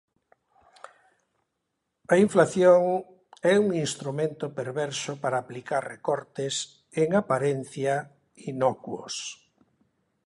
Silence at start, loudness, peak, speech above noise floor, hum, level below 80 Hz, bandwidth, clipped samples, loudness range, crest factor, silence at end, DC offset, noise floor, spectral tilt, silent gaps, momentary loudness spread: 2.1 s; -26 LUFS; -6 dBFS; 55 dB; none; -70 dBFS; 11.5 kHz; under 0.1%; 6 LU; 22 dB; 0.9 s; under 0.1%; -80 dBFS; -5 dB/octave; none; 14 LU